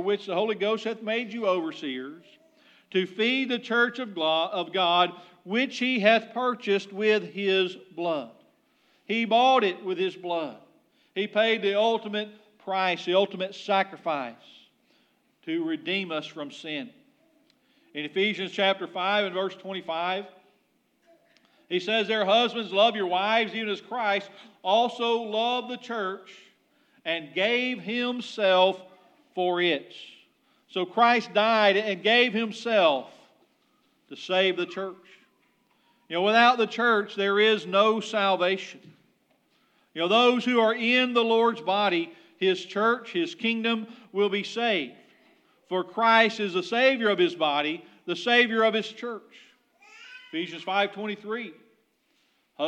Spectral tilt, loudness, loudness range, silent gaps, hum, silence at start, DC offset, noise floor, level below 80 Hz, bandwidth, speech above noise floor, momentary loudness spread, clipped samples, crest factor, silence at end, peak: -4.5 dB/octave; -25 LUFS; 7 LU; none; none; 0 s; under 0.1%; -69 dBFS; under -90 dBFS; 9.2 kHz; 44 dB; 14 LU; under 0.1%; 22 dB; 0 s; -6 dBFS